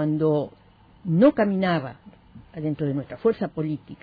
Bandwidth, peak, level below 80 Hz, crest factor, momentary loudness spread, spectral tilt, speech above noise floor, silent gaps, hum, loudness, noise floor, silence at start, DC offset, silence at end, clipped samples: 5 kHz; -6 dBFS; -58 dBFS; 18 dB; 17 LU; -11 dB/octave; 25 dB; none; none; -24 LUFS; -48 dBFS; 0 s; under 0.1%; 0.1 s; under 0.1%